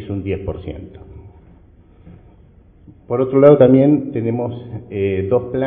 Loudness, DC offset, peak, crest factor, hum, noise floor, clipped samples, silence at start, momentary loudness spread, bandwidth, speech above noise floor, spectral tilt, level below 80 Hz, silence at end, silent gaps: -15 LUFS; under 0.1%; 0 dBFS; 18 dB; none; -47 dBFS; under 0.1%; 0 s; 21 LU; 3.8 kHz; 31 dB; -12 dB/octave; -40 dBFS; 0 s; none